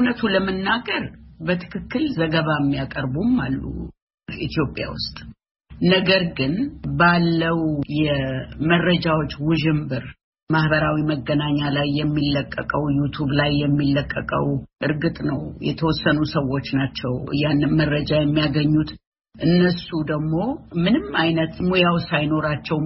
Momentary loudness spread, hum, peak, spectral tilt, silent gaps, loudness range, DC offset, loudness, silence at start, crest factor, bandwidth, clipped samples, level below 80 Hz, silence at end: 8 LU; none; -2 dBFS; -5 dB/octave; 4.02-4.07 s, 4.14-4.18 s, 5.51-5.55 s, 10.24-10.33 s, 10.42-10.47 s, 19.07-19.12 s; 3 LU; under 0.1%; -21 LUFS; 0 s; 18 dB; 6 kHz; under 0.1%; -42 dBFS; 0 s